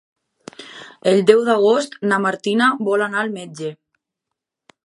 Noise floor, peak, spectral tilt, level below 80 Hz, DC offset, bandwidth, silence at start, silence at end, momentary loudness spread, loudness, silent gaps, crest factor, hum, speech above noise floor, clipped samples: -82 dBFS; 0 dBFS; -5 dB/octave; -72 dBFS; under 0.1%; 11.5 kHz; 0.6 s; 1.1 s; 21 LU; -17 LUFS; none; 20 dB; none; 65 dB; under 0.1%